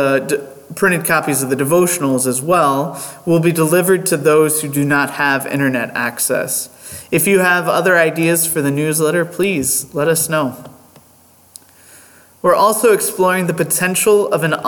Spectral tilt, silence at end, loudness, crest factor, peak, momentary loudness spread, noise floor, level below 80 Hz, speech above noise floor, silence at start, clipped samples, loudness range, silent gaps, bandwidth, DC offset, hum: -4 dB/octave; 0 s; -15 LUFS; 14 dB; -2 dBFS; 7 LU; -48 dBFS; -58 dBFS; 33 dB; 0 s; under 0.1%; 4 LU; none; 19 kHz; under 0.1%; none